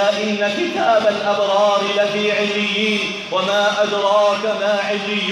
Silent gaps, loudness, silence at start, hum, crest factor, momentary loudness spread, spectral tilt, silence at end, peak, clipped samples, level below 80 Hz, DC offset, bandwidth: none; -17 LUFS; 0 s; none; 12 dB; 4 LU; -3.5 dB/octave; 0 s; -4 dBFS; under 0.1%; -68 dBFS; under 0.1%; 11.5 kHz